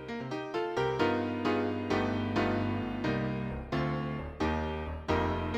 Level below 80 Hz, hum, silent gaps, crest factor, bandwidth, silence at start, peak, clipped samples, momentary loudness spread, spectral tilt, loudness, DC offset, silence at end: -46 dBFS; none; none; 18 dB; 9.4 kHz; 0 s; -14 dBFS; under 0.1%; 6 LU; -7 dB/octave; -32 LUFS; under 0.1%; 0 s